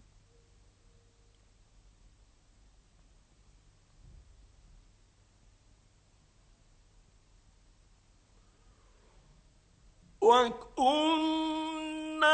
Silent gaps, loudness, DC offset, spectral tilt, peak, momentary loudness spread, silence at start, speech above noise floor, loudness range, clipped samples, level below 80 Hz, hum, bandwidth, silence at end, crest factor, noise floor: none; -29 LUFS; under 0.1%; -3 dB/octave; -12 dBFS; 13 LU; 10.2 s; 38 dB; 3 LU; under 0.1%; -62 dBFS; none; 8.8 kHz; 0 s; 24 dB; -65 dBFS